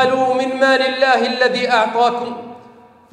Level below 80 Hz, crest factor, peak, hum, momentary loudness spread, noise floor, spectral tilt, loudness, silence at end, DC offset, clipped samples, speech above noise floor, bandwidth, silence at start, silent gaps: -66 dBFS; 14 dB; -2 dBFS; none; 12 LU; -44 dBFS; -3.5 dB/octave; -15 LUFS; 0.55 s; under 0.1%; under 0.1%; 29 dB; 10 kHz; 0 s; none